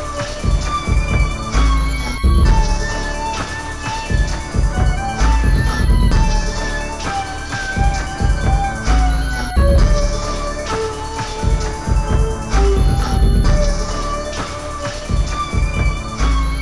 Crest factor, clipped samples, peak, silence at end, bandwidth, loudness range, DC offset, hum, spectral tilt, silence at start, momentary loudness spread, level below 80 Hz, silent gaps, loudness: 12 dB; under 0.1%; -4 dBFS; 0 s; 11.5 kHz; 1 LU; 1%; none; -5 dB/octave; 0 s; 8 LU; -18 dBFS; none; -19 LUFS